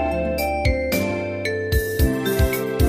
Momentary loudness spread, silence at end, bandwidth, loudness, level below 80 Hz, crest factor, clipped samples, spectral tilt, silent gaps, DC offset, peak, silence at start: 4 LU; 0 s; 15.5 kHz; -22 LUFS; -26 dBFS; 14 dB; under 0.1%; -5.5 dB/octave; none; under 0.1%; -6 dBFS; 0 s